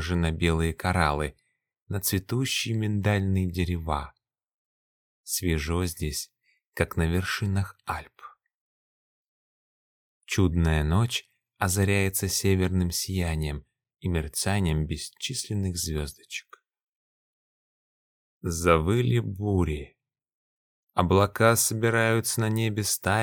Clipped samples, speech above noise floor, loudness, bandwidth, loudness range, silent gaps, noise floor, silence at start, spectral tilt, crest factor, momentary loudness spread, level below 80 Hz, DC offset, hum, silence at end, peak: under 0.1%; over 64 dB; -26 LUFS; 19 kHz; 7 LU; 1.82-1.86 s, 4.54-5.24 s, 6.67-6.72 s, 8.54-10.21 s, 16.83-18.41 s, 20.34-20.87 s; under -90 dBFS; 0 s; -5 dB/octave; 22 dB; 12 LU; -40 dBFS; under 0.1%; none; 0 s; -6 dBFS